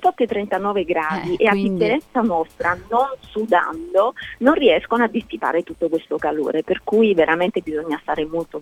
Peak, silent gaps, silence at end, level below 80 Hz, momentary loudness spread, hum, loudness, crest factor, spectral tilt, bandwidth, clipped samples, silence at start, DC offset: -2 dBFS; none; 0 s; -50 dBFS; 7 LU; none; -20 LUFS; 18 dB; -6.5 dB/octave; 14 kHz; under 0.1%; 0 s; under 0.1%